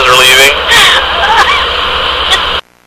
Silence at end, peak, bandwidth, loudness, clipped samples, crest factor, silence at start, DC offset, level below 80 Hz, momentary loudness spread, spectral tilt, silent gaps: 0.25 s; 0 dBFS; over 20 kHz; -5 LUFS; 2%; 8 dB; 0 s; under 0.1%; -28 dBFS; 7 LU; -0.5 dB/octave; none